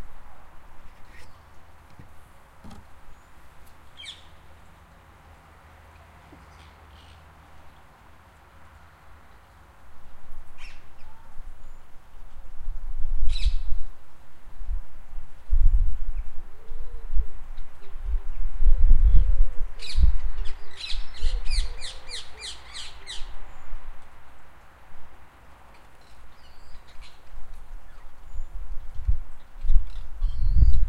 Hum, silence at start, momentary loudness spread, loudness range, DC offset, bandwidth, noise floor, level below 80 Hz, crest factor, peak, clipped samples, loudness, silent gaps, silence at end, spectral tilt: none; 0 s; 26 LU; 23 LU; under 0.1%; 8.8 kHz; -51 dBFS; -26 dBFS; 20 dB; -2 dBFS; under 0.1%; -31 LUFS; none; 0 s; -4.5 dB/octave